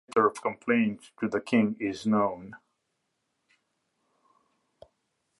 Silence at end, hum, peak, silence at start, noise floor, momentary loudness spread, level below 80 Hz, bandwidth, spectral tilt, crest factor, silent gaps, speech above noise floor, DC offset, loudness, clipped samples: 2.85 s; none; -8 dBFS; 0.15 s; -79 dBFS; 8 LU; -70 dBFS; 11.5 kHz; -6.5 dB/octave; 22 dB; none; 52 dB; under 0.1%; -28 LUFS; under 0.1%